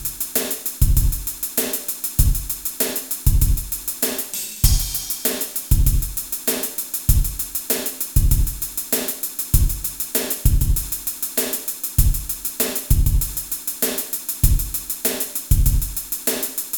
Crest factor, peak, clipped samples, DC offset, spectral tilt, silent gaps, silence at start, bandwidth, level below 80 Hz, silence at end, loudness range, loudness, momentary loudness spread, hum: 20 dB; 0 dBFS; under 0.1%; under 0.1%; -3.5 dB/octave; none; 0 s; over 20 kHz; -22 dBFS; 0 s; 1 LU; -21 LUFS; 5 LU; none